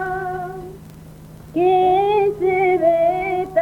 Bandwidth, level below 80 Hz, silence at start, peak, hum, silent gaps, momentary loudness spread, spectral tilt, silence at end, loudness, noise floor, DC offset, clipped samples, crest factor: 15.5 kHz; -48 dBFS; 0 s; -6 dBFS; none; none; 14 LU; -7 dB/octave; 0 s; -18 LUFS; -39 dBFS; under 0.1%; under 0.1%; 14 dB